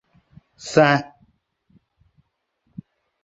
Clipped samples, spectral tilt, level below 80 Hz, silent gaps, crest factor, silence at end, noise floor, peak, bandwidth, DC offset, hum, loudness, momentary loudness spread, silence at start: under 0.1%; -5.5 dB/octave; -62 dBFS; none; 24 dB; 2.2 s; -71 dBFS; -2 dBFS; 8 kHz; under 0.1%; none; -18 LUFS; 27 LU; 0.65 s